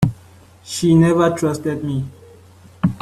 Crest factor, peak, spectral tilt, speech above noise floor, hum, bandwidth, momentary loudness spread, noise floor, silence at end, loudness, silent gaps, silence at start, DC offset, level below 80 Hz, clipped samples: 16 dB; -2 dBFS; -6.5 dB/octave; 29 dB; none; 13.5 kHz; 13 LU; -45 dBFS; 0.05 s; -18 LUFS; none; 0 s; under 0.1%; -46 dBFS; under 0.1%